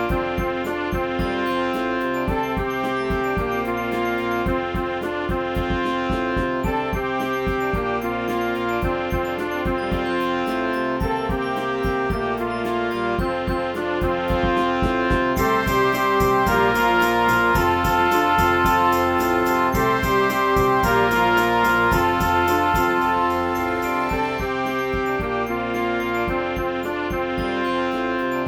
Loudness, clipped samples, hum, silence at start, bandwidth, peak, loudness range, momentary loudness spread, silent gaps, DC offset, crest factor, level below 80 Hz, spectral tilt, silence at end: -21 LUFS; under 0.1%; none; 0 s; over 20 kHz; -6 dBFS; 5 LU; 6 LU; none; under 0.1%; 16 dB; -36 dBFS; -5.5 dB/octave; 0 s